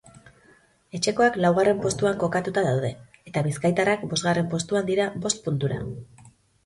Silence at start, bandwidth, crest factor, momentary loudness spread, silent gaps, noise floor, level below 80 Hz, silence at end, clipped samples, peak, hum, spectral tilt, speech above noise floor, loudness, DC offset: 0.25 s; 11.5 kHz; 18 dB; 12 LU; none; -58 dBFS; -56 dBFS; 0.35 s; under 0.1%; -8 dBFS; none; -5 dB/octave; 34 dB; -24 LUFS; under 0.1%